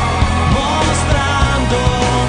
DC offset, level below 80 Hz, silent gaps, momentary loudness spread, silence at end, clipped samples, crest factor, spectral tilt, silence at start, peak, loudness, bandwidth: under 0.1%; -20 dBFS; none; 1 LU; 0 s; under 0.1%; 12 dB; -5 dB/octave; 0 s; 0 dBFS; -14 LUFS; 10.5 kHz